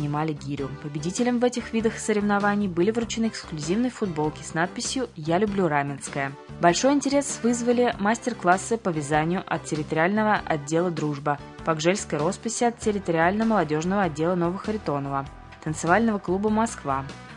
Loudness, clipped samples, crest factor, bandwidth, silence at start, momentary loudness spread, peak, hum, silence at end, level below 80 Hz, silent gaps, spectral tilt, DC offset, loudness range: -25 LUFS; under 0.1%; 20 dB; 11 kHz; 0 s; 8 LU; -4 dBFS; none; 0 s; -52 dBFS; none; -5 dB/octave; under 0.1%; 2 LU